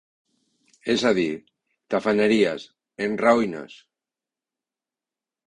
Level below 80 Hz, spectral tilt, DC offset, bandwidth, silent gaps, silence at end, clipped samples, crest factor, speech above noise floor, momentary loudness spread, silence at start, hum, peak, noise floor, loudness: -62 dBFS; -5 dB/octave; under 0.1%; 10.5 kHz; none; 1.75 s; under 0.1%; 20 dB; 68 dB; 17 LU; 0.85 s; none; -4 dBFS; -90 dBFS; -22 LUFS